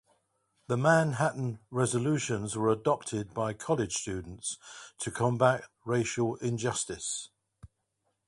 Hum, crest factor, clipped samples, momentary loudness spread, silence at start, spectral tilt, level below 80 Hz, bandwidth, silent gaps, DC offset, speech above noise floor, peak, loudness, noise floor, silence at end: none; 22 dB; under 0.1%; 12 LU; 0.7 s; -5 dB/octave; -60 dBFS; 11.5 kHz; none; under 0.1%; 49 dB; -10 dBFS; -30 LUFS; -79 dBFS; 0.6 s